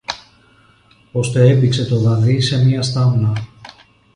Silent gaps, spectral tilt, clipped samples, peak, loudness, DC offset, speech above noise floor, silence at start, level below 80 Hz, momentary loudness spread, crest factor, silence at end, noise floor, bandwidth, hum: none; -6.5 dB/octave; under 0.1%; 0 dBFS; -15 LUFS; under 0.1%; 37 dB; 0.1 s; -46 dBFS; 14 LU; 16 dB; 0.5 s; -51 dBFS; 10.5 kHz; none